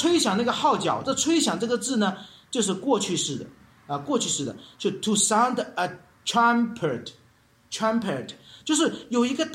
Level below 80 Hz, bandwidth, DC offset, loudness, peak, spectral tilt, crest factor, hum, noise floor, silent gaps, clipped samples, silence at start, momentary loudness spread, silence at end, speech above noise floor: -66 dBFS; 16 kHz; under 0.1%; -25 LUFS; -8 dBFS; -3 dB/octave; 16 dB; none; -59 dBFS; none; under 0.1%; 0 s; 13 LU; 0 s; 35 dB